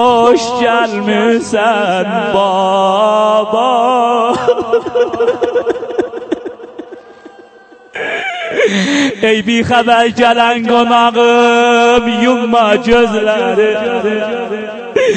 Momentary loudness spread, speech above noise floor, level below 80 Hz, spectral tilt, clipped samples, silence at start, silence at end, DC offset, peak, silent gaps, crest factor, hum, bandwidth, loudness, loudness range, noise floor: 10 LU; 29 dB; -44 dBFS; -4.5 dB/octave; under 0.1%; 0 s; 0 s; under 0.1%; 0 dBFS; none; 12 dB; none; 9 kHz; -11 LUFS; 8 LU; -40 dBFS